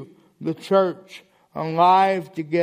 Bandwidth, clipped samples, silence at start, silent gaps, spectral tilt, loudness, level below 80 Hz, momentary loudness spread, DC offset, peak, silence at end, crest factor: 15 kHz; under 0.1%; 0 s; none; -6.5 dB/octave; -20 LUFS; -72 dBFS; 17 LU; under 0.1%; -4 dBFS; 0 s; 16 dB